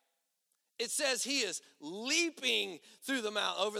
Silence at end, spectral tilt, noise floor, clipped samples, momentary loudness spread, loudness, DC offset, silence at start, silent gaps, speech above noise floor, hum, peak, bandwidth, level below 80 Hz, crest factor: 0 s; -0.5 dB/octave; -82 dBFS; under 0.1%; 11 LU; -33 LUFS; under 0.1%; 0.8 s; none; 47 dB; none; -16 dBFS; 16.5 kHz; under -90 dBFS; 20 dB